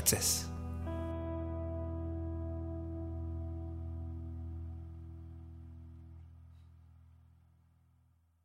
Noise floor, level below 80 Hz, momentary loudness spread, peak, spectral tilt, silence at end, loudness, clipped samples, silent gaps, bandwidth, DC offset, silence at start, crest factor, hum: -70 dBFS; -52 dBFS; 18 LU; -12 dBFS; -4 dB/octave; 1.1 s; -39 LUFS; under 0.1%; none; 16 kHz; under 0.1%; 0 s; 28 dB; none